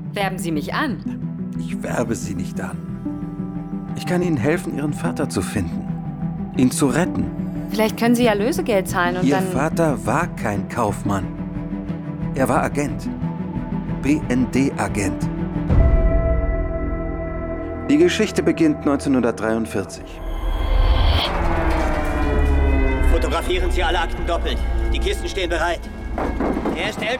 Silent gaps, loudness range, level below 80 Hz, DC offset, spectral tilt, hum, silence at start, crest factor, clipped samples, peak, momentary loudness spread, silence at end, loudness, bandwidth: none; 4 LU; -26 dBFS; under 0.1%; -6 dB/octave; none; 0 s; 16 dB; under 0.1%; -4 dBFS; 10 LU; 0 s; -21 LUFS; 18 kHz